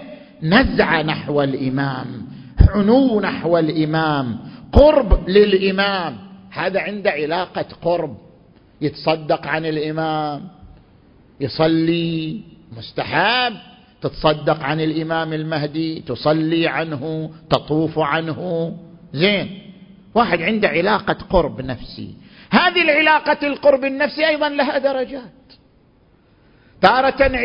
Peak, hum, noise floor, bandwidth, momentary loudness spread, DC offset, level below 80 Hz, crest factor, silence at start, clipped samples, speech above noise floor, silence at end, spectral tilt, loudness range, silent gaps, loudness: 0 dBFS; none; -54 dBFS; 5.8 kHz; 15 LU; under 0.1%; -30 dBFS; 18 dB; 0 s; under 0.1%; 36 dB; 0 s; -8.5 dB/octave; 6 LU; none; -18 LUFS